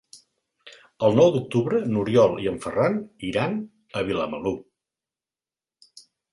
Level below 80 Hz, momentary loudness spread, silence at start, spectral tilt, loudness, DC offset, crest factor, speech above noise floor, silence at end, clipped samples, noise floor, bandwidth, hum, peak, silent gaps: -56 dBFS; 11 LU; 0.15 s; -7 dB/octave; -23 LUFS; under 0.1%; 20 dB; over 68 dB; 1.7 s; under 0.1%; under -90 dBFS; 11.5 kHz; none; -4 dBFS; none